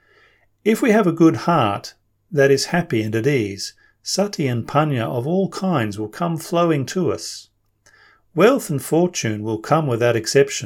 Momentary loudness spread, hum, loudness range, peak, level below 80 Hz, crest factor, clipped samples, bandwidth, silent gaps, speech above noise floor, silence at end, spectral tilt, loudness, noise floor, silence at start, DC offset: 10 LU; none; 4 LU; -2 dBFS; -62 dBFS; 18 dB; under 0.1%; 17 kHz; none; 38 dB; 0 s; -5.5 dB/octave; -19 LUFS; -57 dBFS; 0.65 s; under 0.1%